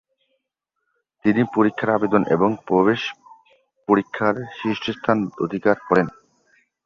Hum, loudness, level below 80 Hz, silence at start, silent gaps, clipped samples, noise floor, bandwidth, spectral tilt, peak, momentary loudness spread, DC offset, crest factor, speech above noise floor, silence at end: none; -21 LUFS; -58 dBFS; 1.25 s; none; under 0.1%; -79 dBFS; 7.2 kHz; -7.5 dB/octave; -2 dBFS; 7 LU; under 0.1%; 20 dB; 59 dB; 0.75 s